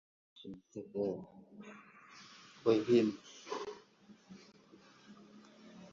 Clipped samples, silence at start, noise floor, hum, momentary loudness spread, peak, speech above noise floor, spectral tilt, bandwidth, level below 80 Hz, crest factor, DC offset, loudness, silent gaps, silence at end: under 0.1%; 0.4 s; -62 dBFS; none; 27 LU; -16 dBFS; 29 dB; -5.5 dB/octave; 7.4 kHz; -78 dBFS; 22 dB; under 0.1%; -35 LUFS; none; 0.05 s